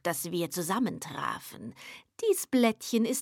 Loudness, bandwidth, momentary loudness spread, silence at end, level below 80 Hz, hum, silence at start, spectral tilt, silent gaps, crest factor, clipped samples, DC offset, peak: -30 LUFS; 18 kHz; 17 LU; 0 s; -74 dBFS; none; 0.05 s; -4 dB/octave; none; 18 dB; under 0.1%; under 0.1%; -12 dBFS